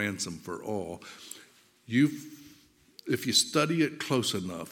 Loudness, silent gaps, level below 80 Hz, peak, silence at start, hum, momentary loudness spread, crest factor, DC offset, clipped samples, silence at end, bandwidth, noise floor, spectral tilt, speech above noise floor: -29 LUFS; none; -70 dBFS; -8 dBFS; 0 s; none; 20 LU; 22 dB; under 0.1%; under 0.1%; 0 s; 17.5 kHz; -60 dBFS; -3.5 dB/octave; 30 dB